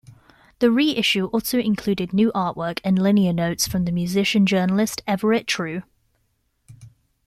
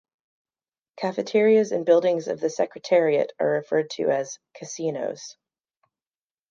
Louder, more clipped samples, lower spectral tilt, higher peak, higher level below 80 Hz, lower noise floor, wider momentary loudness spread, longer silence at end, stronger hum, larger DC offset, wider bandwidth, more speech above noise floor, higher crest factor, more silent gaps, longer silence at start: about the same, -21 LUFS vs -23 LUFS; neither; about the same, -5 dB/octave vs -5 dB/octave; about the same, -4 dBFS vs -6 dBFS; first, -52 dBFS vs -80 dBFS; second, -69 dBFS vs under -90 dBFS; second, 6 LU vs 14 LU; second, 0.4 s vs 1.2 s; neither; neither; first, 15 kHz vs 7.6 kHz; second, 48 dB vs over 67 dB; about the same, 16 dB vs 18 dB; neither; second, 0.1 s vs 0.95 s